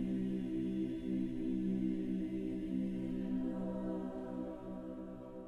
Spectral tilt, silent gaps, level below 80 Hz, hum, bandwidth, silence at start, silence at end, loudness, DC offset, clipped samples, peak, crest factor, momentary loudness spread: -9.5 dB/octave; none; -56 dBFS; none; 5.4 kHz; 0 s; 0 s; -40 LUFS; under 0.1%; under 0.1%; -26 dBFS; 12 dB; 9 LU